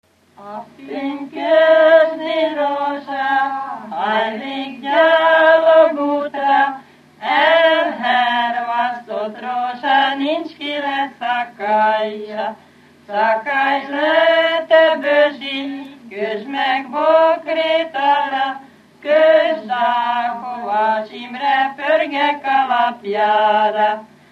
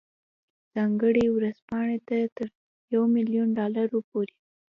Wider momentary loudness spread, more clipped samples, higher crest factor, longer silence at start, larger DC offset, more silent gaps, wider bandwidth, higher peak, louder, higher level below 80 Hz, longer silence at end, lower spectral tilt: first, 14 LU vs 10 LU; neither; about the same, 16 dB vs 14 dB; second, 0.4 s vs 0.75 s; neither; second, none vs 1.62-1.68 s, 2.32-2.36 s, 2.55-2.88 s, 4.04-4.12 s; first, 6.4 kHz vs 5.6 kHz; first, -2 dBFS vs -12 dBFS; first, -16 LUFS vs -26 LUFS; second, -76 dBFS vs -62 dBFS; second, 0.25 s vs 0.5 s; second, -4.5 dB/octave vs -9 dB/octave